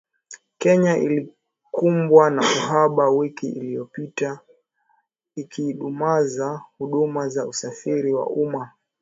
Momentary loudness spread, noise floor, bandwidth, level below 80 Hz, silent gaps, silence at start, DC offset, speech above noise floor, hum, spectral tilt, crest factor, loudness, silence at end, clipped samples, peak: 15 LU; -67 dBFS; 8 kHz; -70 dBFS; none; 0.3 s; under 0.1%; 46 dB; none; -5.5 dB/octave; 20 dB; -21 LUFS; 0.35 s; under 0.1%; 0 dBFS